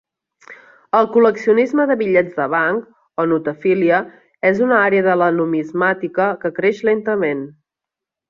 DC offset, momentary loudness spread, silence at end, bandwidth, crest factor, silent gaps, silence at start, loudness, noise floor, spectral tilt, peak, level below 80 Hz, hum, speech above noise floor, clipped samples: under 0.1%; 6 LU; 0.8 s; 7.2 kHz; 16 dB; none; 0.5 s; -17 LUFS; -85 dBFS; -7.5 dB/octave; -2 dBFS; -62 dBFS; none; 69 dB; under 0.1%